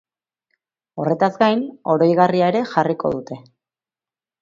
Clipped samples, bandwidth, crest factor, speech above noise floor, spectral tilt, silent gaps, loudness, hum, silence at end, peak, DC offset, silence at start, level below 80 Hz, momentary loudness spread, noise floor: under 0.1%; 7.4 kHz; 18 dB; over 72 dB; -7.5 dB/octave; none; -18 LUFS; none; 1.05 s; -2 dBFS; under 0.1%; 0.95 s; -62 dBFS; 15 LU; under -90 dBFS